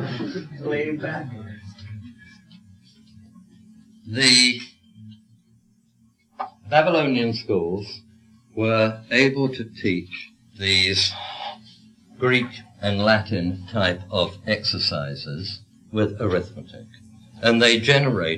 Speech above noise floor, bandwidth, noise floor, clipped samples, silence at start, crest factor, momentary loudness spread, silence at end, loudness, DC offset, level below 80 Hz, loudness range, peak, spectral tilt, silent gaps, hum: 39 dB; 13 kHz; -61 dBFS; under 0.1%; 0 s; 20 dB; 21 LU; 0 s; -21 LUFS; under 0.1%; -60 dBFS; 5 LU; -4 dBFS; -4 dB/octave; none; none